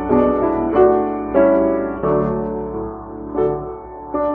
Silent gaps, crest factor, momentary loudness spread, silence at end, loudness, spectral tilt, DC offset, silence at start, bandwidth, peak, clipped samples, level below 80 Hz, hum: none; 16 dB; 14 LU; 0 s; -18 LUFS; -8.5 dB/octave; under 0.1%; 0 s; 3.5 kHz; -2 dBFS; under 0.1%; -38 dBFS; none